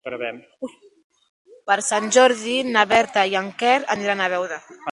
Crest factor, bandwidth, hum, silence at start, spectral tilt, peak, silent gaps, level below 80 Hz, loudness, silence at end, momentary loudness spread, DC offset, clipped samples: 20 dB; 11.5 kHz; none; 0.05 s; -2 dB/octave; 0 dBFS; 1.04-1.10 s, 1.29-1.45 s; -66 dBFS; -19 LUFS; 0 s; 19 LU; under 0.1%; under 0.1%